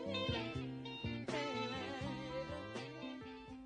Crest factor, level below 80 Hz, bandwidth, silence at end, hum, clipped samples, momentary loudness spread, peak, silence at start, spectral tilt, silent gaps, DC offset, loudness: 18 dB; -64 dBFS; 10 kHz; 0 s; none; under 0.1%; 8 LU; -26 dBFS; 0 s; -5.5 dB/octave; none; under 0.1%; -43 LUFS